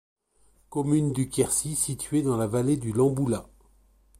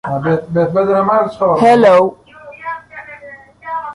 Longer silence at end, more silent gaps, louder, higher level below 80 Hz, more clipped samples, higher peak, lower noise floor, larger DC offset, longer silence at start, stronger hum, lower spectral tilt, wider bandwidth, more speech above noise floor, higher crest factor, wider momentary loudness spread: first, 0.75 s vs 0 s; neither; second, -26 LUFS vs -12 LUFS; about the same, -54 dBFS vs -52 dBFS; neither; second, -10 dBFS vs -2 dBFS; first, -63 dBFS vs -37 dBFS; neither; first, 0.7 s vs 0.05 s; neither; second, -6 dB/octave vs -7.5 dB/octave; first, 16 kHz vs 11 kHz; first, 38 dB vs 25 dB; first, 18 dB vs 12 dB; second, 5 LU vs 23 LU